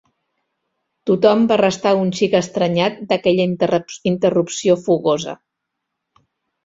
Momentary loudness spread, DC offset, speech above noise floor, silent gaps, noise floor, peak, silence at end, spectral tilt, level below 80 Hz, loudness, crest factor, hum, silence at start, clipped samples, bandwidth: 7 LU; under 0.1%; 62 dB; none; -78 dBFS; -2 dBFS; 1.3 s; -5.5 dB/octave; -58 dBFS; -17 LUFS; 16 dB; none; 1.05 s; under 0.1%; 8 kHz